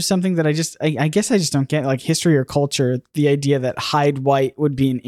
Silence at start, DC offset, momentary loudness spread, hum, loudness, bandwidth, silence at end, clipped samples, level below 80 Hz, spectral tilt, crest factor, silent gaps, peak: 0 s; under 0.1%; 3 LU; none; -19 LUFS; 15 kHz; 0 s; under 0.1%; -56 dBFS; -5.5 dB/octave; 14 dB; none; -4 dBFS